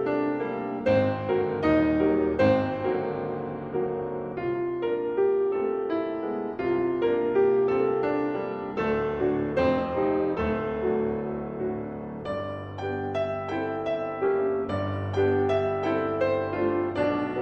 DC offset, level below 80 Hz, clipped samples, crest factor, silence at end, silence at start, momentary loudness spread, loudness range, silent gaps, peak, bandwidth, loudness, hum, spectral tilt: under 0.1%; -54 dBFS; under 0.1%; 16 dB; 0 s; 0 s; 9 LU; 5 LU; none; -10 dBFS; 6.4 kHz; -27 LUFS; none; -8.5 dB/octave